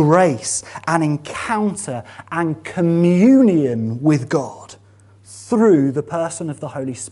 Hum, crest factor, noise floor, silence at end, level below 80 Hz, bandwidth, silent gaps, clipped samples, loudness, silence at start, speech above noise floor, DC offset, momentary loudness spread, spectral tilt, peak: none; 18 dB; -47 dBFS; 0 s; -58 dBFS; 11.5 kHz; none; under 0.1%; -18 LUFS; 0 s; 30 dB; under 0.1%; 14 LU; -6.5 dB/octave; 0 dBFS